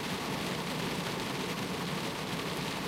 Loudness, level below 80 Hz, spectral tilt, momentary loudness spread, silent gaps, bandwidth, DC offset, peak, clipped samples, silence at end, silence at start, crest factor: -35 LUFS; -58 dBFS; -4 dB/octave; 1 LU; none; 16 kHz; under 0.1%; -22 dBFS; under 0.1%; 0 s; 0 s; 14 dB